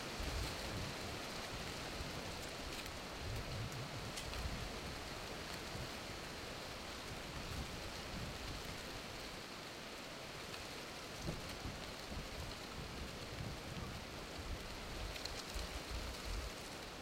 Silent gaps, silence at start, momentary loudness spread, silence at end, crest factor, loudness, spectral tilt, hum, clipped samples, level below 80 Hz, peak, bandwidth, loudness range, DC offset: none; 0 s; 3 LU; 0 s; 20 dB; -46 LUFS; -3.5 dB/octave; none; under 0.1%; -52 dBFS; -26 dBFS; 16 kHz; 2 LU; under 0.1%